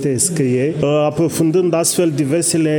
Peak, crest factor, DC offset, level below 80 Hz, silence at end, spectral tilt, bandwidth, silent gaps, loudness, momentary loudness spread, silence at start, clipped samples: -2 dBFS; 12 dB; under 0.1%; -54 dBFS; 0 s; -5 dB/octave; over 20 kHz; none; -15 LUFS; 2 LU; 0 s; under 0.1%